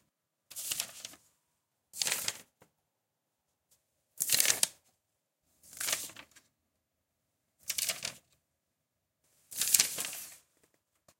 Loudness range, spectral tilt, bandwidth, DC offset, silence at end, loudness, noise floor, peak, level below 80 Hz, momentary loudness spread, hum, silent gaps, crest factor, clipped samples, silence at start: 7 LU; 1.5 dB/octave; 17 kHz; under 0.1%; 0.8 s; -31 LUFS; -84 dBFS; -4 dBFS; -80 dBFS; 22 LU; none; none; 34 dB; under 0.1%; 0.5 s